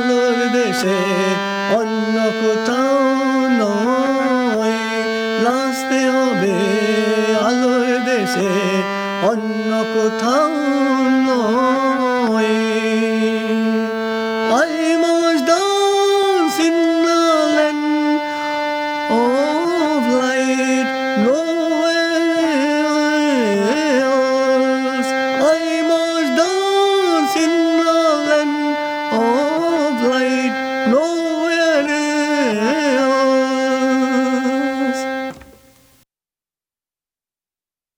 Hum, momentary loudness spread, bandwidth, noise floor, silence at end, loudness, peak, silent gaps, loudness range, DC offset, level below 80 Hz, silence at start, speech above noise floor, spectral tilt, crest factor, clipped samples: none; 4 LU; 18 kHz; under -90 dBFS; 2.55 s; -16 LUFS; -4 dBFS; none; 2 LU; under 0.1%; -62 dBFS; 0 s; over 74 dB; -4 dB/octave; 14 dB; under 0.1%